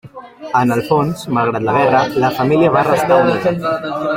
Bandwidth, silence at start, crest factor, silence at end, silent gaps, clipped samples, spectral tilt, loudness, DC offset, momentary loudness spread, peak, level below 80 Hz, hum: 16.5 kHz; 0.05 s; 14 dB; 0 s; none; under 0.1%; -6.5 dB/octave; -15 LUFS; under 0.1%; 7 LU; 0 dBFS; -50 dBFS; none